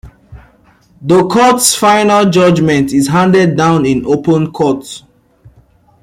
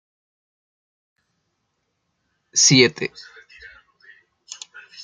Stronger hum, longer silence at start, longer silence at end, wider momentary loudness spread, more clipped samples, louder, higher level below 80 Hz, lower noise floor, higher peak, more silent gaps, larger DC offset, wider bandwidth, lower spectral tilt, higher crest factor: neither; second, 0.05 s vs 2.55 s; second, 1.05 s vs 1.95 s; second, 7 LU vs 26 LU; neither; first, -10 LUFS vs -16 LUFS; first, -44 dBFS vs -66 dBFS; second, -47 dBFS vs -74 dBFS; about the same, 0 dBFS vs -2 dBFS; neither; neither; first, 16.5 kHz vs 11 kHz; first, -5 dB/octave vs -2.5 dB/octave; second, 12 dB vs 24 dB